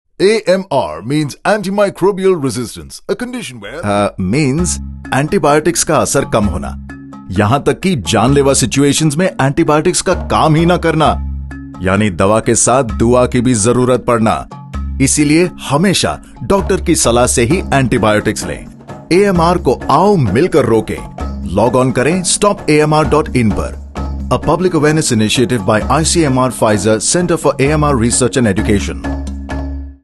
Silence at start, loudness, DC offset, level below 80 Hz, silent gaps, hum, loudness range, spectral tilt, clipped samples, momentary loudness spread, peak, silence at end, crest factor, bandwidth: 0.2 s; -13 LUFS; under 0.1%; -28 dBFS; none; none; 3 LU; -5 dB/octave; under 0.1%; 12 LU; 0 dBFS; 0.1 s; 12 dB; 12.5 kHz